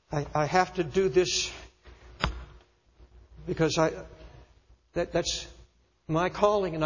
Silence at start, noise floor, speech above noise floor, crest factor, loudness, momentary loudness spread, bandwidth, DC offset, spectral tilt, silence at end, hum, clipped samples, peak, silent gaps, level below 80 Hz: 0.1 s; -60 dBFS; 33 dB; 24 dB; -28 LUFS; 18 LU; 7.4 kHz; under 0.1%; -4.5 dB/octave; 0 s; none; under 0.1%; -6 dBFS; none; -48 dBFS